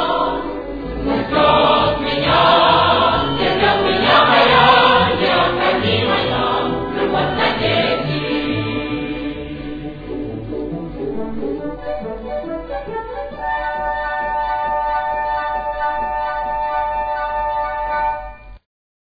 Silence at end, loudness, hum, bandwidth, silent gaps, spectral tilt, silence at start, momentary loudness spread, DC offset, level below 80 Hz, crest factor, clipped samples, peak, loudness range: 0.45 s; -17 LUFS; none; 5 kHz; none; -7 dB/octave; 0 s; 15 LU; under 0.1%; -38 dBFS; 16 dB; under 0.1%; 0 dBFS; 13 LU